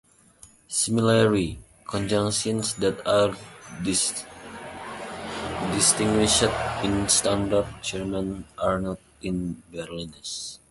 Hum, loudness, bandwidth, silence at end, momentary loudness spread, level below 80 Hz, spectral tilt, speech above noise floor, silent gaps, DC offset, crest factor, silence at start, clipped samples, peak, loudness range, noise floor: none; -24 LUFS; 12 kHz; 0.15 s; 16 LU; -46 dBFS; -3.5 dB/octave; 29 dB; none; under 0.1%; 20 dB; 0.45 s; under 0.1%; -4 dBFS; 4 LU; -53 dBFS